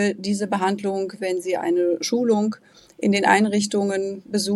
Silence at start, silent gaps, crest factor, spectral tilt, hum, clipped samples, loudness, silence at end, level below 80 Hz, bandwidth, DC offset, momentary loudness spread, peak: 0 s; none; 20 dB; -4.5 dB/octave; none; under 0.1%; -22 LUFS; 0 s; -68 dBFS; 13 kHz; under 0.1%; 9 LU; -2 dBFS